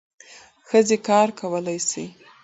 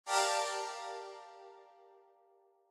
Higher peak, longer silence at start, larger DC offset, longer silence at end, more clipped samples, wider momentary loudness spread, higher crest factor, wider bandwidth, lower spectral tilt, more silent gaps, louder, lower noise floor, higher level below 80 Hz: first, -4 dBFS vs -18 dBFS; first, 0.7 s vs 0.05 s; neither; second, 0.35 s vs 0.85 s; neither; second, 11 LU vs 25 LU; about the same, 18 dB vs 20 dB; second, 8.2 kHz vs 14.5 kHz; first, -4 dB/octave vs 2 dB/octave; neither; first, -21 LUFS vs -36 LUFS; second, -48 dBFS vs -69 dBFS; first, -68 dBFS vs under -90 dBFS